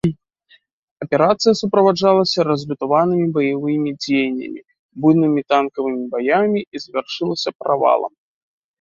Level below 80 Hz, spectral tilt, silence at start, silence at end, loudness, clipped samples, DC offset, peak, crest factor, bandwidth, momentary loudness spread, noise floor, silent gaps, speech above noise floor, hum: -60 dBFS; -6 dB/octave; 0.05 s; 0.75 s; -18 LUFS; under 0.1%; under 0.1%; -2 dBFS; 16 dB; 7.8 kHz; 11 LU; -56 dBFS; 0.73-0.96 s, 4.79-4.89 s, 6.67-6.72 s, 7.55-7.59 s; 38 dB; none